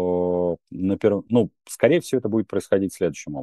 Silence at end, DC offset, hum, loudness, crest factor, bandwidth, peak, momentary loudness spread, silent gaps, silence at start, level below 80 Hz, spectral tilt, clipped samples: 0 s; under 0.1%; none; -23 LUFS; 20 dB; 12.5 kHz; -2 dBFS; 7 LU; none; 0 s; -58 dBFS; -6.5 dB/octave; under 0.1%